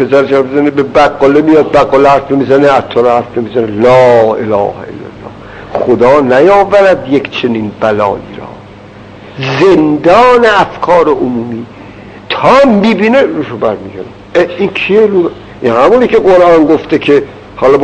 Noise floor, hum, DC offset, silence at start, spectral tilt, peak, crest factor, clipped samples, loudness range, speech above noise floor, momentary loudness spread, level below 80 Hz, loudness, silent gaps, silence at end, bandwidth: -31 dBFS; none; under 0.1%; 0 s; -6.5 dB/octave; 0 dBFS; 8 dB; 3%; 3 LU; 24 dB; 15 LU; -38 dBFS; -8 LUFS; none; 0 s; 9 kHz